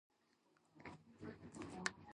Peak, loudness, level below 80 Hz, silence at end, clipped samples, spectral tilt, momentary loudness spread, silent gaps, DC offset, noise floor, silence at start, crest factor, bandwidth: -18 dBFS; -52 LUFS; -76 dBFS; 0.05 s; under 0.1%; -3.5 dB/octave; 12 LU; none; under 0.1%; -78 dBFS; 0.75 s; 36 dB; 11 kHz